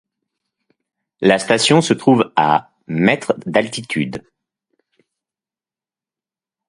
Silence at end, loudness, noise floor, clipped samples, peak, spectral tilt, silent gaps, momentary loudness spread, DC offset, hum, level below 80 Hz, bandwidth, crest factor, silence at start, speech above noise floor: 2.5 s; -16 LUFS; under -90 dBFS; under 0.1%; 0 dBFS; -4.5 dB/octave; none; 9 LU; under 0.1%; none; -58 dBFS; 11.5 kHz; 20 dB; 1.2 s; over 74 dB